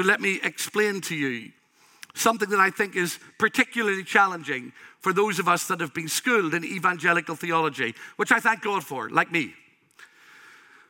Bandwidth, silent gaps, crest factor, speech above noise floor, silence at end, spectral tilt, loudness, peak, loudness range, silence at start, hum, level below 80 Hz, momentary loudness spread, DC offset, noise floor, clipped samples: 17 kHz; none; 22 dB; 29 dB; 0.85 s; -3.5 dB/octave; -24 LUFS; -4 dBFS; 2 LU; 0 s; none; -80 dBFS; 9 LU; under 0.1%; -54 dBFS; under 0.1%